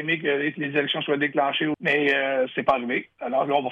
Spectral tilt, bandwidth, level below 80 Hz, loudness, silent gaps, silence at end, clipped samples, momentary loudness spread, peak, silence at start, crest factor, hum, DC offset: -6.5 dB/octave; 7.4 kHz; -62 dBFS; -23 LUFS; none; 0 s; under 0.1%; 5 LU; -8 dBFS; 0 s; 16 dB; none; under 0.1%